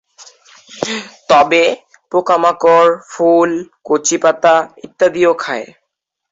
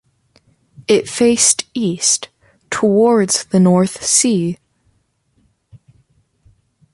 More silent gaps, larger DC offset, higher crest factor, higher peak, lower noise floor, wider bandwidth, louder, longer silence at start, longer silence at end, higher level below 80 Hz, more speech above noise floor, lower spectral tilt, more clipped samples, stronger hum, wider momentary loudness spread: neither; neither; about the same, 14 dB vs 18 dB; about the same, 0 dBFS vs 0 dBFS; first, -74 dBFS vs -62 dBFS; second, 8 kHz vs 11.5 kHz; about the same, -13 LUFS vs -14 LUFS; second, 0.2 s vs 0.8 s; second, 0.65 s vs 1.2 s; about the same, -60 dBFS vs -56 dBFS; first, 61 dB vs 48 dB; about the same, -3 dB/octave vs -4 dB/octave; neither; neither; about the same, 14 LU vs 12 LU